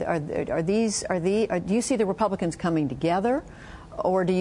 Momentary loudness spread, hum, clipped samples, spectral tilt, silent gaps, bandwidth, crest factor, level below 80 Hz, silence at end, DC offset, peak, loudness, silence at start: 6 LU; none; under 0.1%; -5.5 dB/octave; none; 11 kHz; 16 dB; -50 dBFS; 0 s; under 0.1%; -8 dBFS; -25 LUFS; 0 s